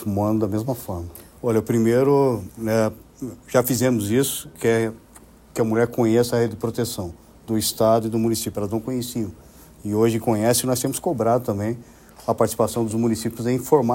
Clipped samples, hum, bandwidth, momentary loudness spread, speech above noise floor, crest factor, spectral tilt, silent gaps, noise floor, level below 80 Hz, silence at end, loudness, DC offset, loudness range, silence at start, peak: under 0.1%; none; 16.5 kHz; 11 LU; 27 dB; 18 dB; -5.5 dB/octave; none; -48 dBFS; -52 dBFS; 0 s; -22 LUFS; under 0.1%; 2 LU; 0 s; -4 dBFS